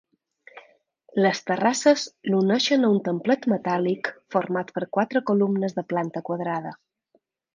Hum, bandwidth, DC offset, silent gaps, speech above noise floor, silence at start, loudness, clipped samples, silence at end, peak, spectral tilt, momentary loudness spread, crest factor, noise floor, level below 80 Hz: none; 9.6 kHz; under 0.1%; none; 45 dB; 0.55 s; -24 LUFS; under 0.1%; 0.8 s; -6 dBFS; -5 dB/octave; 9 LU; 20 dB; -68 dBFS; -74 dBFS